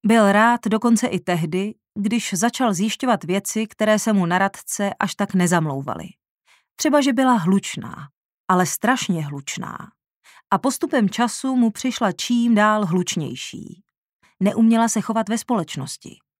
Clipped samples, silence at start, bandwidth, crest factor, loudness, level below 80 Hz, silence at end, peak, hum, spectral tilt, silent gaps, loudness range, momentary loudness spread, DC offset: under 0.1%; 0.05 s; 16 kHz; 16 dB; -20 LUFS; -66 dBFS; 0.3 s; -4 dBFS; none; -4.5 dB/octave; 6.30-6.38 s, 8.17-8.44 s, 10.15-10.21 s, 13.98-14.20 s; 3 LU; 13 LU; under 0.1%